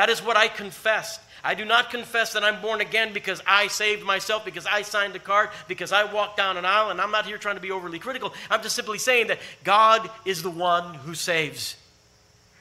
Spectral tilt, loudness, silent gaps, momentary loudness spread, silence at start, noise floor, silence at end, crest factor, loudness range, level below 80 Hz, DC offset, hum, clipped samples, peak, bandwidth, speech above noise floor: -1.5 dB/octave; -23 LUFS; none; 11 LU; 0 s; -58 dBFS; 0.85 s; 22 dB; 2 LU; -68 dBFS; under 0.1%; none; under 0.1%; -2 dBFS; 16 kHz; 33 dB